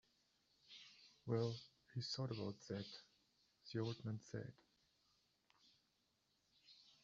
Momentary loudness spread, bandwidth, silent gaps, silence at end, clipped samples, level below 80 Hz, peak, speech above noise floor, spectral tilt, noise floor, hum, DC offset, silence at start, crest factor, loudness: 20 LU; 7.4 kHz; none; 0.15 s; under 0.1%; -82 dBFS; -30 dBFS; 37 dB; -6 dB/octave; -84 dBFS; none; under 0.1%; 0.7 s; 22 dB; -48 LUFS